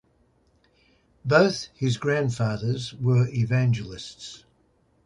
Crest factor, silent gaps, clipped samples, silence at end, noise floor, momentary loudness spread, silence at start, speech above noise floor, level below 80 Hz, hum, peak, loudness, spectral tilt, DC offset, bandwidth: 20 dB; none; under 0.1%; 0.7 s; -65 dBFS; 17 LU; 1.25 s; 41 dB; -56 dBFS; none; -6 dBFS; -24 LUFS; -6.5 dB/octave; under 0.1%; 10.5 kHz